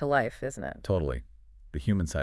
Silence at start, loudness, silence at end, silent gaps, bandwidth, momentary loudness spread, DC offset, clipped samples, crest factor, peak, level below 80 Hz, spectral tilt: 0 s; -31 LUFS; 0 s; none; 12 kHz; 11 LU; under 0.1%; under 0.1%; 18 dB; -12 dBFS; -42 dBFS; -6.5 dB/octave